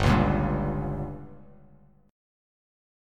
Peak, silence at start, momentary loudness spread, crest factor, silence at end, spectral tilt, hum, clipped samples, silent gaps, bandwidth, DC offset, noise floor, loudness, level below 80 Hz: -8 dBFS; 0 s; 20 LU; 20 dB; 1 s; -7.5 dB/octave; 50 Hz at -50 dBFS; under 0.1%; none; 12 kHz; under 0.1%; -57 dBFS; -27 LUFS; -38 dBFS